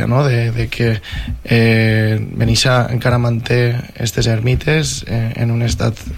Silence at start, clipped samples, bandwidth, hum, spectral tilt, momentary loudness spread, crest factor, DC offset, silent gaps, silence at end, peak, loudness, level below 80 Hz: 0 s; under 0.1%; 15 kHz; none; -5.5 dB/octave; 7 LU; 12 dB; under 0.1%; none; 0 s; -2 dBFS; -16 LUFS; -30 dBFS